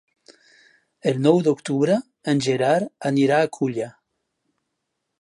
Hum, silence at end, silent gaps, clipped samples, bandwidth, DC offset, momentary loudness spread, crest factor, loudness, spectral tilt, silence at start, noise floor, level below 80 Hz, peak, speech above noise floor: none; 1.3 s; none; under 0.1%; 11 kHz; under 0.1%; 8 LU; 20 dB; -21 LUFS; -6 dB/octave; 0.3 s; -78 dBFS; -70 dBFS; -2 dBFS; 58 dB